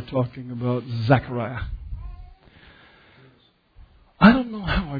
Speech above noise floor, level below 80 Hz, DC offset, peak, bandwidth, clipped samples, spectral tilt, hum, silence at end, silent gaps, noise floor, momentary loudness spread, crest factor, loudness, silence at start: 34 dB; -38 dBFS; under 0.1%; 0 dBFS; 5 kHz; under 0.1%; -9.5 dB/octave; none; 0 s; none; -58 dBFS; 21 LU; 24 dB; -22 LUFS; 0 s